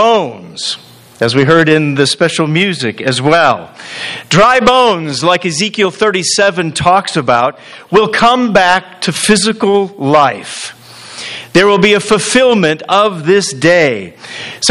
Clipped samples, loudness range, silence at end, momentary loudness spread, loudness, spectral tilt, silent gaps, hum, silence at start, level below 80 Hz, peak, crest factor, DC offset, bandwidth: 0.4%; 2 LU; 0 s; 14 LU; -10 LUFS; -4 dB/octave; none; none; 0 s; -44 dBFS; 0 dBFS; 12 dB; under 0.1%; 12.5 kHz